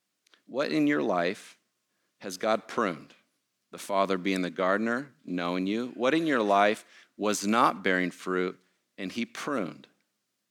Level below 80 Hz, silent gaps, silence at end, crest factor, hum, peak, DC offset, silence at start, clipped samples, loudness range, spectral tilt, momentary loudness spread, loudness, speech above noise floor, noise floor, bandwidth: -82 dBFS; none; 0.75 s; 22 dB; none; -8 dBFS; under 0.1%; 0.5 s; under 0.1%; 5 LU; -4.5 dB/octave; 13 LU; -28 LUFS; 50 dB; -79 dBFS; 17.5 kHz